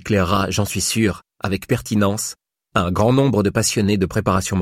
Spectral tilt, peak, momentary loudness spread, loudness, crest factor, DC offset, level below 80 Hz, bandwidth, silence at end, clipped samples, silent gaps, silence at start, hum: -5 dB/octave; -4 dBFS; 9 LU; -19 LUFS; 16 dB; under 0.1%; -42 dBFS; 16.5 kHz; 0 s; under 0.1%; none; 0.05 s; none